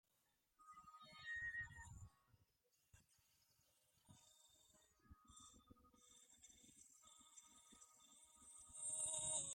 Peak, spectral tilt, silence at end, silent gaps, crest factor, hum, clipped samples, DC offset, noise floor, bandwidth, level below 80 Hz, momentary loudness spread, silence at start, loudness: -32 dBFS; -0.5 dB/octave; 0 s; none; 24 dB; none; under 0.1%; under 0.1%; -85 dBFS; 16 kHz; -78 dBFS; 23 LU; 0.6 s; -48 LUFS